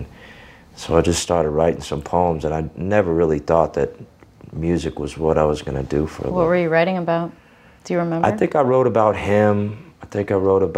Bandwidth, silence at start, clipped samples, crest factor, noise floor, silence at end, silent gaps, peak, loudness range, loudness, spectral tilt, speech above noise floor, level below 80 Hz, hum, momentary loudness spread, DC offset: 14 kHz; 0 s; under 0.1%; 18 dB; -43 dBFS; 0 s; none; -2 dBFS; 2 LU; -19 LUFS; -6 dB/octave; 25 dB; -42 dBFS; none; 10 LU; under 0.1%